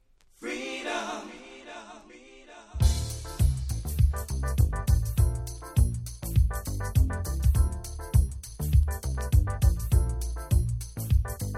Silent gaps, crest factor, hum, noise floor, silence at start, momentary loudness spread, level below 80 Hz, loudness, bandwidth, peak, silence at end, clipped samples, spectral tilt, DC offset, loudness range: none; 16 dB; none; -51 dBFS; 0.4 s; 13 LU; -28 dBFS; -28 LUFS; 15.5 kHz; -10 dBFS; 0 s; under 0.1%; -5.5 dB/octave; under 0.1%; 5 LU